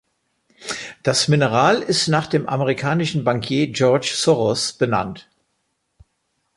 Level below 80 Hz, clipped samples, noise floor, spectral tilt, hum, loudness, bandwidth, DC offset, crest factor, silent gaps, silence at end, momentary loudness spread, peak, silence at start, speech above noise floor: -56 dBFS; under 0.1%; -71 dBFS; -4.5 dB/octave; none; -19 LUFS; 11.5 kHz; under 0.1%; 18 dB; none; 1.35 s; 12 LU; -2 dBFS; 0.6 s; 53 dB